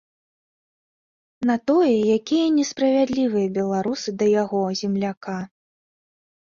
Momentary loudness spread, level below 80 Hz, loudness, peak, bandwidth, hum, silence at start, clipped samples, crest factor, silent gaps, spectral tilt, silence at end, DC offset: 9 LU; -64 dBFS; -21 LUFS; -8 dBFS; 7.4 kHz; none; 1.4 s; under 0.1%; 14 dB; 5.17-5.21 s; -5.5 dB/octave; 1.1 s; under 0.1%